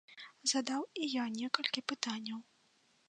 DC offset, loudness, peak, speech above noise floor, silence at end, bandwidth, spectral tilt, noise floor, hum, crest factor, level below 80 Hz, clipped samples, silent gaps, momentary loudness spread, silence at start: under 0.1%; -36 LUFS; -10 dBFS; 35 dB; 0.65 s; 10 kHz; -1.5 dB/octave; -72 dBFS; none; 28 dB; under -90 dBFS; under 0.1%; none; 10 LU; 0.1 s